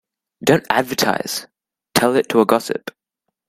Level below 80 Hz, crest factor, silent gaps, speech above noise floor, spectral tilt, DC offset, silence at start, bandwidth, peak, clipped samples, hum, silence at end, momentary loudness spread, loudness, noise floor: -56 dBFS; 20 dB; none; 61 dB; -4 dB/octave; under 0.1%; 0.4 s; 16 kHz; 0 dBFS; under 0.1%; none; 0.6 s; 11 LU; -18 LUFS; -78 dBFS